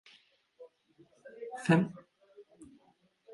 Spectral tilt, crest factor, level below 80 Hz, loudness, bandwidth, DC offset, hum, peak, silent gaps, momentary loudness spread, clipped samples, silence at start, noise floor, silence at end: -7 dB/octave; 24 dB; -74 dBFS; -31 LUFS; 11.5 kHz; under 0.1%; none; -12 dBFS; none; 28 LU; under 0.1%; 0.6 s; -70 dBFS; 0 s